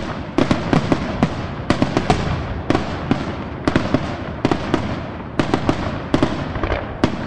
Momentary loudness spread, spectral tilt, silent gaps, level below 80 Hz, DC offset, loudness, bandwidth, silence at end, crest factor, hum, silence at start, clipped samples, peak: 6 LU; -6.5 dB/octave; none; -34 dBFS; 2%; -21 LUFS; 11 kHz; 0 s; 20 dB; none; 0 s; under 0.1%; 0 dBFS